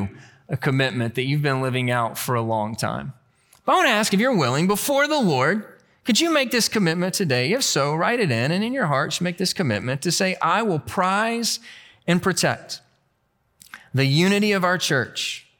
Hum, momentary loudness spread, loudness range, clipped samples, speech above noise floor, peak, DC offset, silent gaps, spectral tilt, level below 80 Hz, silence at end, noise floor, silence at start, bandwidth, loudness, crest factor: none; 9 LU; 4 LU; under 0.1%; 47 dB; -6 dBFS; under 0.1%; none; -4 dB/octave; -62 dBFS; 0.2 s; -68 dBFS; 0 s; 19 kHz; -21 LUFS; 16 dB